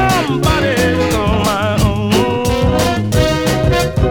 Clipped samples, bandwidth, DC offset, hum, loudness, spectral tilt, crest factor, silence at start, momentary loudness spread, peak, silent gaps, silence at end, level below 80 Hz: under 0.1%; 19 kHz; under 0.1%; none; -14 LUFS; -5.5 dB/octave; 14 dB; 0 s; 1 LU; 0 dBFS; none; 0 s; -24 dBFS